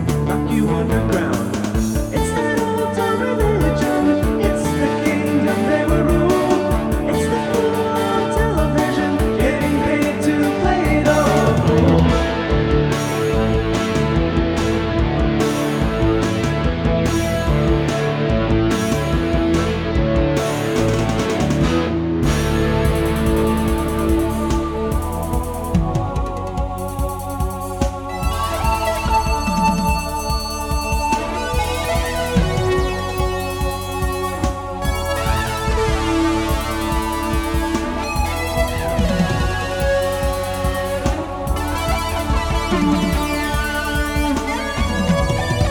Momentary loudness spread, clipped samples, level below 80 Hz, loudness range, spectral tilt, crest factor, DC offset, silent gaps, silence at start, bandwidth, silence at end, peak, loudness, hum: 5 LU; under 0.1%; -26 dBFS; 4 LU; -6 dB/octave; 16 dB; under 0.1%; none; 0 s; 19 kHz; 0 s; -2 dBFS; -19 LUFS; none